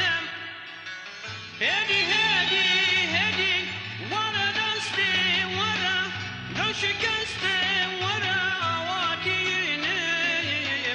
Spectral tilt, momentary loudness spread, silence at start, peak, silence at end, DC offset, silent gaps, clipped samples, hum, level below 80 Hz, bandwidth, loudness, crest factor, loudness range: -2.5 dB/octave; 13 LU; 0 s; -12 dBFS; 0 s; under 0.1%; none; under 0.1%; none; -62 dBFS; 10.5 kHz; -23 LUFS; 14 dB; 3 LU